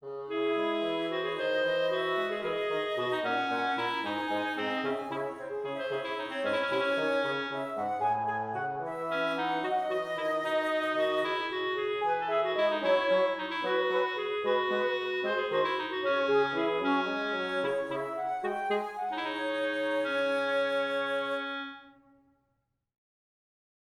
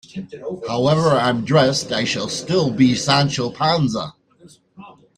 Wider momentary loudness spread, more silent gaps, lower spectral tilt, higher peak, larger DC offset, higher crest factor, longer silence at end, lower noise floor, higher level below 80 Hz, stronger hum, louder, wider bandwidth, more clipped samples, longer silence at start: second, 6 LU vs 13 LU; neither; about the same, -4.5 dB/octave vs -5 dB/octave; second, -16 dBFS vs -2 dBFS; neither; about the same, 14 dB vs 18 dB; first, 2.1 s vs 0.25 s; first, -79 dBFS vs -50 dBFS; second, -74 dBFS vs -54 dBFS; neither; second, -30 LUFS vs -18 LUFS; first, 14.5 kHz vs 11 kHz; neither; second, 0 s vs 0.15 s